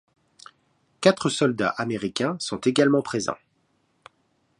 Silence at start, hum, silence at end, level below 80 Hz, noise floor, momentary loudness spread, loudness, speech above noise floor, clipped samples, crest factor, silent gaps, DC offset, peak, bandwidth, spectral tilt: 1 s; none; 1.25 s; -64 dBFS; -68 dBFS; 8 LU; -23 LUFS; 46 dB; under 0.1%; 24 dB; none; under 0.1%; -2 dBFS; 11.5 kHz; -4.5 dB/octave